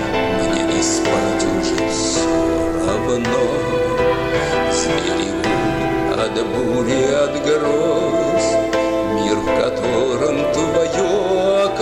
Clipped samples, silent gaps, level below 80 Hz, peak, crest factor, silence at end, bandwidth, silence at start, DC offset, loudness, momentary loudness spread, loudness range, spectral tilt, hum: under 0.1%; none; -38 dBFS; -6 dBFS; 12 dB; 0 s; 15.5 kHz; 0 s; under 0.1%; -18 LUFS; 2 LU; 1 LU; -4.5 dB/octave; none